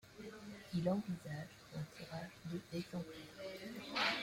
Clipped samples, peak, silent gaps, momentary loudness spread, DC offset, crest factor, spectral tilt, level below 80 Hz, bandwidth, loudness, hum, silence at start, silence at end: under 0.1%; -24 dBFS; none; 13 LU; under 0.1%; 20 dB; -5.5 dB/octave; -72 dBFS; 16.5 kHz; -44 LUFS; none; 0.05 s; 0 s